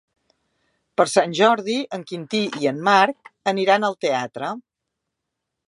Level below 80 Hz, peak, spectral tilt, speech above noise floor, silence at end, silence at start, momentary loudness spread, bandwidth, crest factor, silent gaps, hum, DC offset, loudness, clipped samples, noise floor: -74 dBFS; 0 dBFS; -4 dB/octave; 61 dB; 1.1 s; 1 s; 13 LU; 11.5 kHz; 22 dB; none; none; under 0.1%; -21 LUFS; under 0.1%; -81 dBFS